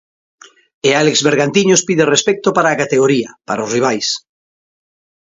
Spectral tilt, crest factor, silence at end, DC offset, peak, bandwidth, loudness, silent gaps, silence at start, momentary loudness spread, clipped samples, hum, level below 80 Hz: -3.5 dB/octave; 16 dB; 1.05 s; under 0.1%; 0 dBFS; 7.8 kHz; -14 LUFS; none; 0.85 s; 7 LU; under 0.1%; none; -60 dBFS